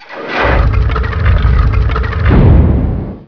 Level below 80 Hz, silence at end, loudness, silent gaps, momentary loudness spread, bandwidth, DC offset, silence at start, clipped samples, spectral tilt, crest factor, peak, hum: -12 dBFS; 0.05 s; -12 LUFS; none; 7 LU; 5.4 kHz; under 0.1%; 0 s; 1%; -9 dB/octave; 10 dB; 0 dBFS; none